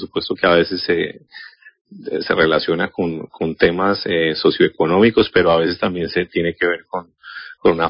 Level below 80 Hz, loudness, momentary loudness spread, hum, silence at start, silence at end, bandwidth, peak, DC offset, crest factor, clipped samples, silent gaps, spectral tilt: -46 dBFS; -17 LUFS; 15 LU; none; 0 s; 0 s; 5.4 kHz; 0 dBFS; under 0.1%; 18 dB; under 0.1%; 1.81-1.85 s; -10 dB/octave